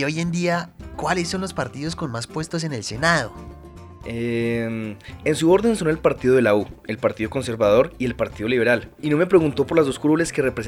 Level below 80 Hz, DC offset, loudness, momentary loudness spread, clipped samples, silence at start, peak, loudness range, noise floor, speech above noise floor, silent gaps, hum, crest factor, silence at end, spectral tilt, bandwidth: -46 dBFS; under 0.1%; -21 LUFS; 11 LU; under 0.1%; 0 s; -4 dBFS; 5 LU; -41 dBFS; 20 dB; none; none; 18 dB; 0 s; -5.5 dB/octave; 15.5 kHz